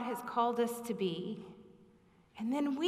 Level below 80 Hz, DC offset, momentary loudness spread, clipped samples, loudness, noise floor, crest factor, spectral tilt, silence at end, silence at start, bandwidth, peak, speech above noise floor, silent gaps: -78 dBFS; under 0.1%; 12 LU; under 0.1%; -36 LUFS; -65 dBFS; 18 dB; -5.5 dB/octave; 0 s; 0 s; 15.5 kHz; -20 dBFS; 30 dB; none